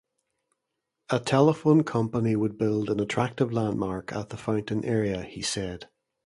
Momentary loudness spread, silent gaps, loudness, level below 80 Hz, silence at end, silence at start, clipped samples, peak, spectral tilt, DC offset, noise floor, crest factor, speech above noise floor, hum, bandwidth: 11 LU; none; -26 LUFS; -56 dBFS; 0.4 s; 1.1 s; under 0.1%; -6 dBFS; -6 dB/octave; under 0.1%; -83 dBFS; 20 dB; 57 dB; none; 11.5 kHz